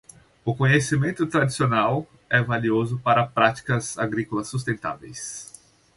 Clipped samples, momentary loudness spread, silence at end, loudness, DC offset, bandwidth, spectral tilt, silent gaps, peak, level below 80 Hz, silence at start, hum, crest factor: under 0.1%; 13 LU; 0.5 s; -23 LUFS; under 0.1%; 11.5 kHz; -5.5 dB/octave; none; -4 dBFS; -56 dBFS; 0.45 s; none; 20 dB